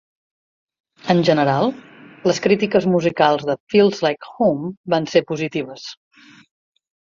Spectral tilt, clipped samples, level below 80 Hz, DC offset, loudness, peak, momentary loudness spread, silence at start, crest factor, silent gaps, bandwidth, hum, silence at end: -6 dB/octave; under 0.1%; -60 dBFS; under 0.1%; -18 LUFS; -2 dBFS; 11 LU; 1.05 s; 18 dB; 3.60-3.67 s, 4.77-4.84 s; 7.6 kHz; none; 1.1 s